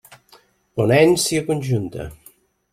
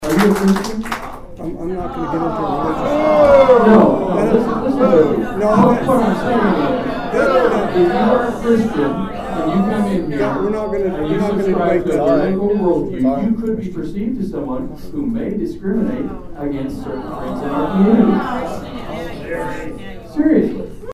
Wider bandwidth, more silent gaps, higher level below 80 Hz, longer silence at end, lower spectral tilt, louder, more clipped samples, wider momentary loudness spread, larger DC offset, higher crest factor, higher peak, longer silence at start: about the same, 16 kHz vs 15 kHz; neither; second, -50 dBFS vs -34 dBFS; first, 0.6 s vs 0 s; second, -5 dB/octave vs -7.5 dB/octave; about the same, -18 LUFS vs -16 LUFS; neither; first, 18 LU vs 14 LU; neither; about the same, 18 dB vs 14 dB; about the same, -2 dBFS vs 0 dBFS; first, 0.75 s vs 0 s